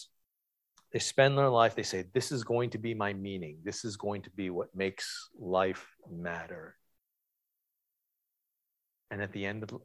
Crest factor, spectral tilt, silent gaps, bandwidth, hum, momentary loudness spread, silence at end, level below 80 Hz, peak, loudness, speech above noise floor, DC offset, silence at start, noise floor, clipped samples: 24 dB; -4.5 dB/octave; none; 13 kHz; none; 15 LU; 0.05 s; -66 dBFS; -10 dBFS; -32 LUFS; 52 dB; under 0.1%; 0 s; -85 dBFS; under 0.1%